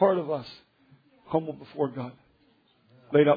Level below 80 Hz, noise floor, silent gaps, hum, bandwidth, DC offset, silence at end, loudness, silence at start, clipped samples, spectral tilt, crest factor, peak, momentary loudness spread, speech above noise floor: -70 dBFS; -65 dBFS; none; none; 5 kHz; under 0.1%; 0 s; -29 LUFS; 0 s; under 0.1%; -9.5 dB/octave; 20 dB; -8 dBFS; 18 LU; 39 dB